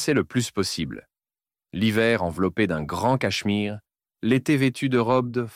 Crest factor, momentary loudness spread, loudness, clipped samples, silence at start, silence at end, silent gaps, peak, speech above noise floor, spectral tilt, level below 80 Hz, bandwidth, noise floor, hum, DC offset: 16 dB; 10 LU; -24 LUFS; under 0.1%; 0 s; 0 s; none; -8 dBFS; over 67 dB; -5.5 dB/octave; -54 dBFS; 16 kHz; under -90 dBFS; none; under 0.1%